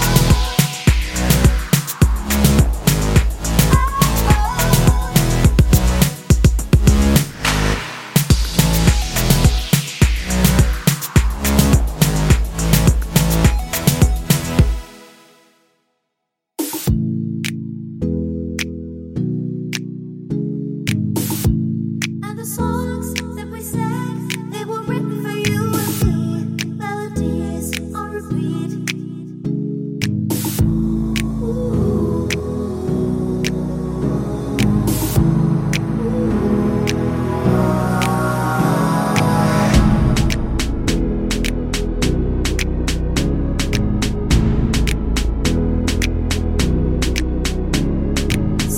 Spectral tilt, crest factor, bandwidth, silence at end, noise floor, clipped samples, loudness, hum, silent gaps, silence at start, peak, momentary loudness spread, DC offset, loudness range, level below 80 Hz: -5.5 dB/octave; 16 dB; 17 kHz; 0 s; -77 dBFS; under 0.1%; -18 LUFS; none; none; 0 s; 0 dBFS; 9 LU; under 0.1%; 8 LU; -22 dBFS